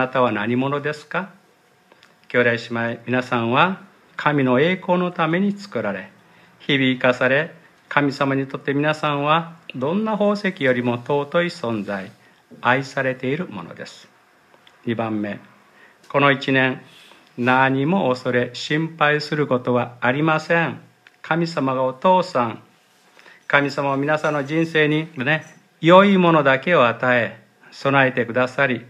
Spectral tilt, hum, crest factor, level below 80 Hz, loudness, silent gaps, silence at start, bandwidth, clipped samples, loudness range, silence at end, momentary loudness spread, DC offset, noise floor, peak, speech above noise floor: -6.5 dB/octave; none; 20 dB; -70 dBFS; -20 LUFS; none; 0 s; 11 kHz; under 0.1%; 7 LU; 0.05 s; 11 LU; under 0.1%; -56 dBFS; 0 dBFS; 37 dB